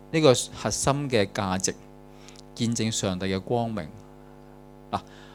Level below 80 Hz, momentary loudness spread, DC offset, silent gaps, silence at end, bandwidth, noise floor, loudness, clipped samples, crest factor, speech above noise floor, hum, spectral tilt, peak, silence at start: -52 dBFS; 21 LU; under 0.1%; none; 0 s; 18 kHz; -48 dBFS; -26 LUFS; under 0.1%; 24 dB; 22 dB; 50 Hz at -50 dBFS; -4.5 dB/octave; -4 dBFS; 0 s